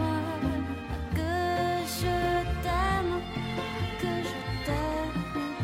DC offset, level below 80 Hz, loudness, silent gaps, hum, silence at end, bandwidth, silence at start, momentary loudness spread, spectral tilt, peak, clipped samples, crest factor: under 0.1%; -40 dBFS; -30 LUFS; none; none; 0 s; 16 kHz; 0 s; 6 LU; -5.5 dB/octave; -16 dBFS; under 0.1%; 14 dB